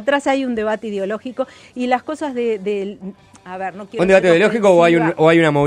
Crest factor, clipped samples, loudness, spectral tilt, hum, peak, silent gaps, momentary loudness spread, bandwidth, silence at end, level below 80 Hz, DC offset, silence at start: 16 dB; under 0.1%; -16 LUFS; -6 dB/octave; none; 0 dBFS; none; 15 LU; 11 kHz; 0 s; -54 dBFS; under 0.1%; 0 s